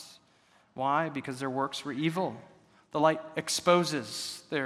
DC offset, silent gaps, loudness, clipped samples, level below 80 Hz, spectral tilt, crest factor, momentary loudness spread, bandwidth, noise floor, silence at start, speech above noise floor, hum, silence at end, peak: under 0.1%; none; -30 LUFS; under 0.1%; -76 dBFS; -4 dB/octave; 22 dB; 11 LU; 15.5 kHz; -64 dBFS; 0 s; 34 dB; none; 0 s; -8 dBFS